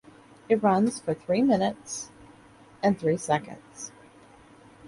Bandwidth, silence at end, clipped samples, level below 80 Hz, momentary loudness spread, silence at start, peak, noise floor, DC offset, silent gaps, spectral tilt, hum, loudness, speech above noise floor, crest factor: 11.5 kHz; 0 s; under 0.1%; -64 dBFS; 18 LU; 0.5 s; -10 dBFS; -53 dBFS; under 0.1%; none; -5.5 dB/octave; none; -26 LUFS; 28 dB; 18 dB